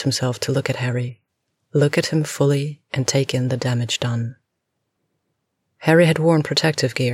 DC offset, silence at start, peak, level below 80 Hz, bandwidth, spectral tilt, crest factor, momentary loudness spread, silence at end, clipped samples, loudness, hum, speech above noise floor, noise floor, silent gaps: under 0.1%; 0 s; -4 dBFS; -62 dBFS; 14.5 kHz; -5 dB/octave; 18 dB; 9 LU; 0 s; under 0.1%; -20 LUFS; none; 57 dB; -76 dBFS; none